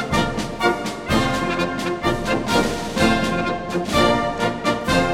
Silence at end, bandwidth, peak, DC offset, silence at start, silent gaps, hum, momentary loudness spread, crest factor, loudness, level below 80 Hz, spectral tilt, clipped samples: 0 s; 17.5 kHz; -2 dBFS; under 0.1%; 0 s; none; none; 5 LU; 18 dB; -20 LUFS; -36 dBFS; -4.5 dB/octave; under 0.1%